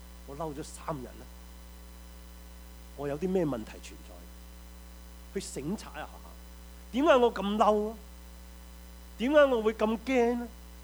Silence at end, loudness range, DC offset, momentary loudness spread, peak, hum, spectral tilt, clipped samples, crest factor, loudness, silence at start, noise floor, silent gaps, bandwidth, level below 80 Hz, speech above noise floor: 0 s; 13 LU; under 0.1%; 25 LU; -10 dBFS; none; -5.5 dB/octave; under 0.1%; 22 dB; -29 LUFS; 0 s; -48 dBFS; none; over 20 kHz; -48 dBFS; 19 dB